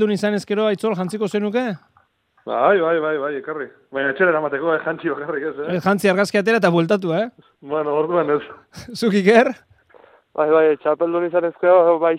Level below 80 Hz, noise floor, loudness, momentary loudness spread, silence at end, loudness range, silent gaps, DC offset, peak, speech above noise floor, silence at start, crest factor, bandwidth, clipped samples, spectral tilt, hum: -66 dBFS; -59 dBFS; -19 LUFS; 13 LU; 0 s; 3 LU; none; under 0.1%; 0 dBFS; 41 dB; 0 s; 18 dB; 14.5 kHz; under 0.1%; -6 dB/octave; none